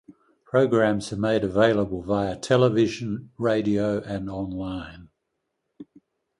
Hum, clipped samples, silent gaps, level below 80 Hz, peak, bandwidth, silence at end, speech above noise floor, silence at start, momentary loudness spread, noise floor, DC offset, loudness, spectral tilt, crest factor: none; under 0.1%; none; -52 dBFS; -4 dBFS; 11.5 kHz; 0.55 s; 55 dB; 0.1 s; 11 LU; -79 dBFS; under 0.1%; -24 LUFS; -6.5 dB/octave; 20 dB